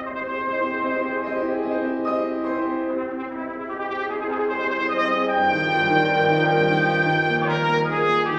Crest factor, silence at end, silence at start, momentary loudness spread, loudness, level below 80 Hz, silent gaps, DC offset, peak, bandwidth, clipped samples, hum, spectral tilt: 18 dB; 0 s; 0 s; 9 LU; -22 LUFS; -60 dBFS; none; under 0.1%; -4 dBFS; 8.4 kHz; under 0.1%; none; -7 dB/octave